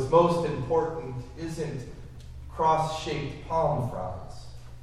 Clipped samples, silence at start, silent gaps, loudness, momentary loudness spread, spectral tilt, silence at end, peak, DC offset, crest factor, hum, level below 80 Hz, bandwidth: under 0.1%; 0 s; none; -28 LUFS; 20 LU; -6.5 dB/octave; 0 s; -8 dBFS; under 0.1%; 20 dB; none; -46 dBFS; 12.5 kHz